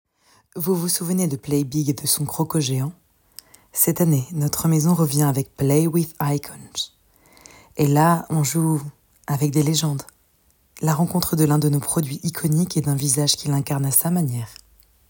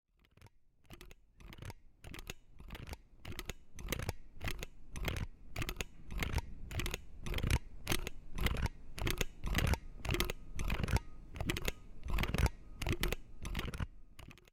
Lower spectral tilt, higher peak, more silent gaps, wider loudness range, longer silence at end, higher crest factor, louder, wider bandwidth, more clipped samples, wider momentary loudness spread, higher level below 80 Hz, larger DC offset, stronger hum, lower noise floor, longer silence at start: about the same, -5 dB/octave vs -4.5 dB/octave; first, -2 dBFS vs -14 dBFS; neither; second, 3 LU vs 9 LU; first, 0.55 s vs 0.2 s; second, 20 dB vs 26 dB; first, -21 LUFS vs -41 LUFS; about the same, 18.5 kHz vs 17 kHz; neither; second, 11 LU vs 16 LU; second, -54 dBFS vs -42 dBFS; neither; neither; about the same, -61 dBFS vs -64 dBFS; about the same, 0.55 s vs 0.45 s